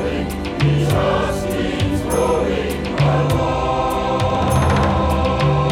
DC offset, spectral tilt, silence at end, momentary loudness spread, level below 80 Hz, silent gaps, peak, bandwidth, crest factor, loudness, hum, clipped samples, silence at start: under 0.1%; -6.5 dB/octave; 0 s; 5 LU; -30 dBFS; none; -6 dBFS; 17.5 kHz; 12 dB; -18 LUFS; none; under 0.1%; 0 s